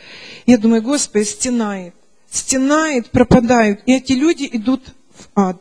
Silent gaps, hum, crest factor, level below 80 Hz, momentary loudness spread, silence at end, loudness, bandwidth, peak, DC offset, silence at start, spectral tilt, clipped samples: none; none; 16 dB; -40 dBFS; 11 LU; 0.05 s; -15 LUFS; 10.5 kHz; 0 dBFS; 0.4%; 0.1 s; -4.5 dB/octave; under 0.1%